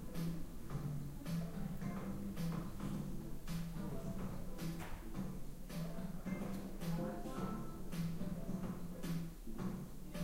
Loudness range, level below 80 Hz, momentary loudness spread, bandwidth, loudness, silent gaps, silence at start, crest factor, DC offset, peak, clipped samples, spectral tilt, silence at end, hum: 2 LU; -50 dBFS; 5 LU; 16 kHz; -45 LUFS; none; 0 s; 14 dB; under 0.1%; -28 dBFS; under 0.1%; -6.5 dB/octave; 0 s; none